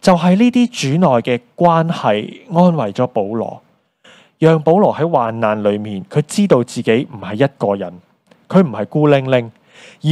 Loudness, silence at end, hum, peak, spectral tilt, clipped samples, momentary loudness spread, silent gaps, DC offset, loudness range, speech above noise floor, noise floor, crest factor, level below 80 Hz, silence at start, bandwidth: -15 LUFS; 0 s; none; 0 dBFS; -7 dB/octave; under 0.1%; 9 LU; none; under 0.1%; 2 LU; 34 dB; -49 dBFS; 14 dB; -58 dBFS; 0.05 s; 12.5 kHz